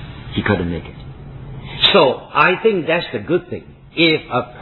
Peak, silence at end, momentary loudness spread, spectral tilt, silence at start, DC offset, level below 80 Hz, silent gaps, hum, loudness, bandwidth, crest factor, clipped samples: 0 dBFS; 0 s; 21 LU; -7.5 dB/octave; 0 s; under 0.1%; -42 dBFS; none; none; -16 LUFS; 5.2 kHz; 18 dB; under 0.1%